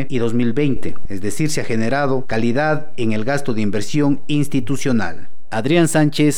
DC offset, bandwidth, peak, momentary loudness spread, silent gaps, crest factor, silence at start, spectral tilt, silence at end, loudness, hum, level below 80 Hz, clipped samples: 10%; 18 kHz; -4 dBFS; 9 LU; none; 14 dB; 0 s; -5.5 dB/octave; 0 s; -19 LUFS; none; -42 dBFS; under 0.1%